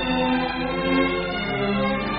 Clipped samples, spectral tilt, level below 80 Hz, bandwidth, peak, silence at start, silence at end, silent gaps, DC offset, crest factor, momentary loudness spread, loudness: under 0.1%; -3.5 dB/octave; -40 dBFS; 5.2 kHz; -8 dBFS; 0 s; 0 s; none; under 0.1%; 14 dB; 4 LU; -23 LUFS